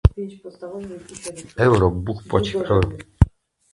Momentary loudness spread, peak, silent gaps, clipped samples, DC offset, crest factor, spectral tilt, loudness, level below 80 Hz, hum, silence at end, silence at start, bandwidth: 17 LU; 0 dBFS; none; under 0.1%; under 0.1%; 20 dB; -7 dB/octave; -20 LUFS; -28 dBFS; none; 0.45 s; 0.05 s; 11.5 kHz